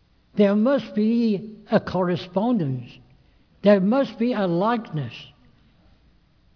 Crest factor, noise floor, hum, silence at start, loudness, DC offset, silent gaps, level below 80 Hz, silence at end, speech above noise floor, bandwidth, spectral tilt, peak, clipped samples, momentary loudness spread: 18 dB; -58 dBFS; none; 0.35 s; -22 LUFS; under 0.1%; none; -60 dBFS; 1.3 s; 37 dB; 5.4 kHz; -9 dB/octave; -6 dBFS; under 0.1%; 13 LU